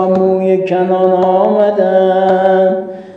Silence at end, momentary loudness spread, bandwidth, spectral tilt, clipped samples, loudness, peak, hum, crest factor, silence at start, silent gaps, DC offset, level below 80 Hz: 0 s; 3 LU; 5.8 kHz; -8.5 dB/octave; under 0.1%; -11 LUFS; 0 dBFS; none; 10 dB; 0 s; none; under 0.1%; -58 dBFS